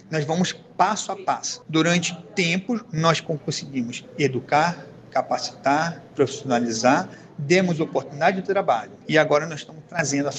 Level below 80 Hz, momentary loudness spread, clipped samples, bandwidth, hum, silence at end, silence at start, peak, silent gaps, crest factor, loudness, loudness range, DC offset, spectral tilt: -64 dBFS; 8 LU; under 0.1%; 9.2 kHz; none; 0 s; 0.1 s; -4 dBFS; none; 20 dB; -23 LUFS; 2 LU; under 0.1%; -4.5 dB/octave